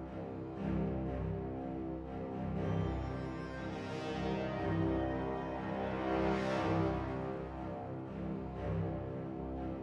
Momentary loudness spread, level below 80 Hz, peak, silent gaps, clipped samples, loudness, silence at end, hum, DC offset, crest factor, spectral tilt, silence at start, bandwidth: 8 LU; -50 dBFS; -20 dBFS; none; under 0.1%; -38 LUFS; 0 s; none; under 0.1%; 18 dB; -8 dB/octave; 0 s; 8.4 kHz